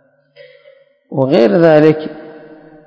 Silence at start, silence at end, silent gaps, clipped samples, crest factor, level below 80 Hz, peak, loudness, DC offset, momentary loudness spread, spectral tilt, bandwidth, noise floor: 1.1 s; 0.5 s; none; 0.6%; 14 dB; -60 dBFS; 0 dBFS; -11 LUFS; under 0.1%; 19 LU; -8.5 dB/octave; 8 kHz; -47 dBFS